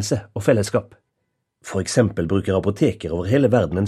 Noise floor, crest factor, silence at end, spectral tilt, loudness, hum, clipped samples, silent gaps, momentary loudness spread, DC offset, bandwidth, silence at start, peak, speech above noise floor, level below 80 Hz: -75 dBFS; 18 dB; 0 s; -6 dB/octave; -20 LUFS; none; under 0.1%; none; 9 LU; under 0.1%; 13.5 kHz; 0 s; -4 dBFS; 55 dB; -46 dBFS